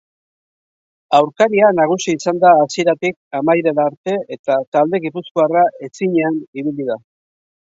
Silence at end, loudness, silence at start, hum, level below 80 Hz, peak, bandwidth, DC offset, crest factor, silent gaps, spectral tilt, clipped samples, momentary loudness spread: 0.75 s; -16 LUFS; 1.1 s; none; -66 dBFS; 0 dBFS; 7.8 kHz; under 0.1%; 16 dB; 3.16-3.31 s, 3.97-4.04 s, 4.39-4.44 s, 4.67-4.72 s, 5.31-5.35 s, 6.48-6.53 s; -5.5 dB/octave; under 0.1%; 10 LU